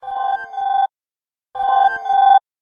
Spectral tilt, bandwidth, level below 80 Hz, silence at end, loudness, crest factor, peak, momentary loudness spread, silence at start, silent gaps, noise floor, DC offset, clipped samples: -2 dB/octave; 5 kHz; -62 dBFS; 0.25 s; -17 LUFS; 16 dB; -2 dBFS; 11 LU; 0.05 s; none; under -90 dBFS; under 0.1%; under 0.1%